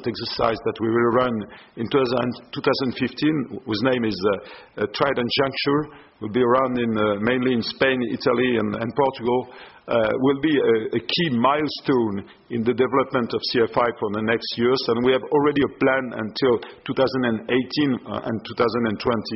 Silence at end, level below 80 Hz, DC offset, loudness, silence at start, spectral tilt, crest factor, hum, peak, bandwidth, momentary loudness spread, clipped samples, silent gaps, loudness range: 0 s; -56 dBFS; under 0.1%; -22 LUFS; 0 s; -4 dB/octave; 18 dB; none; -4 dBFS; 6 kHz; 8 LU; under 0.1%; none; 2 LU